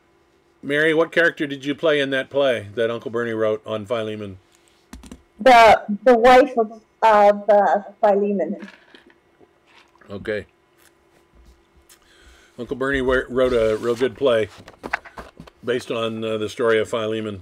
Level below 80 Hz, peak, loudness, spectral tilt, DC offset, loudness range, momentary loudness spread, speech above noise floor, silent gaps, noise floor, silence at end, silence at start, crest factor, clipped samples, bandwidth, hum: -48 dBFS; -8 dBFS; -19 LUFS; -5 dB/octave; under 0.1%; 18 LU; 16 LU; 40 dB; none; -59 dBFS; 0 s; 0.65 s; 12 dB; under 0.1%; 15 kHz; none